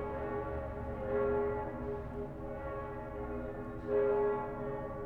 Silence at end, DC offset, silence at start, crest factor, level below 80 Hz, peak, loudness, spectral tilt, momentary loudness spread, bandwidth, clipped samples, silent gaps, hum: 0 s; under 0.1%; 0 s; 16 dB; -48 dBFS; -22 dBFS; -37 LUFS; -9.5 dB/octave; 11 LU; 4.2 kHz; under 0.1%; none; none